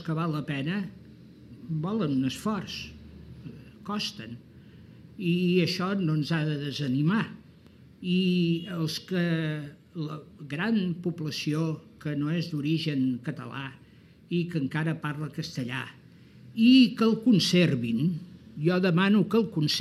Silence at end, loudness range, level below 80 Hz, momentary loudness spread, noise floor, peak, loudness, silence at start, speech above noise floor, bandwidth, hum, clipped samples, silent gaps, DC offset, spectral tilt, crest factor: 0 s; 9 LU; -62 dBFS; 18 LU; -53 dBFS; -10 dBFS; -27 LUFS; 0 s; 27 dB; 13.5 kHz; none; under 0.1%; none; under 0.1%; -6 dB/octave; 18 dB